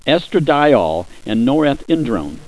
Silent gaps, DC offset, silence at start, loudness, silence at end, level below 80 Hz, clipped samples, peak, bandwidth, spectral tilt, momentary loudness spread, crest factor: none; 1%; 0.05 s; -16 LUFS; 0.05 s; -40 dBFS; under 0.1%; 0 dBFS; 11 kHz; -7 dB/octave; 9 LU; 16 dB